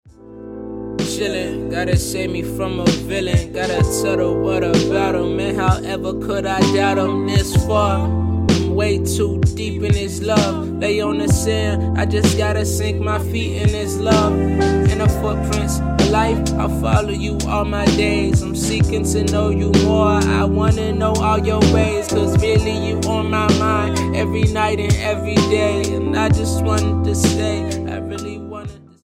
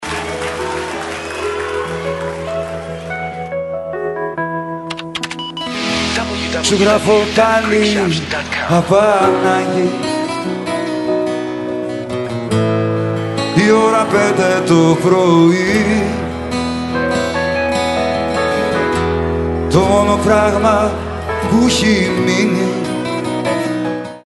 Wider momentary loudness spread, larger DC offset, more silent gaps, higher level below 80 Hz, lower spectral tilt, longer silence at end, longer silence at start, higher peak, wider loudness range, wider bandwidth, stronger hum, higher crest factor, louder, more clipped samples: second, 7 LU vs 11 LU; neither; neither; first, -28 dBFS vs -36 dBFS; about the same, -5.5 dB/octave vs -5 dB/octave; first, 0.25 s vs 0.05 s; about the same, 0.05 s vs 0 s; about the same, 0 dBFS vs 0 dBFS; second, 2 LU vs 9 LU; first, 15.5 kHz vs 11.5 kHz; neither; about the same, 16 dB vs 16 dB; second, -18 LUFS vs -15 LUFS; neither